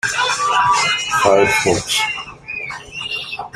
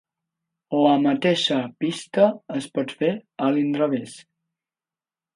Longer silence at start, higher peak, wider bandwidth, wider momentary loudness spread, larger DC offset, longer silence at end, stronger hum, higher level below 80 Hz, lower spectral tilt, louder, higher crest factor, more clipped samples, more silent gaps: second, 0.05 s vs 0.7 s; first, 0 dBFS vs -4 dBFS; first, 15.5 kHz vs 11.5 kHz; first, 13 LU vs 9 LU; neither; second, 0.05 s vs 1.15 s; neither; first, -48 dBFS vs -74 dBFS; second, -2 dB/octave vs -5.5 dB/octave; first, -16 LUFS vs -22 LUFS; about the same, 18 dB vs 20 dB; neither; neither